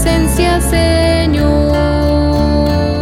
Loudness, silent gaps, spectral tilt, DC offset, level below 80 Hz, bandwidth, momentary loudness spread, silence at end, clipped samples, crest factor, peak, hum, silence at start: -12 LUFS; none; -6 dB/octave; under 0.1%; -18 dBFS; 16 kHz; 1 LU; 0 s; under 0.1%; 10 dB; 0 dBFS; none; 0 s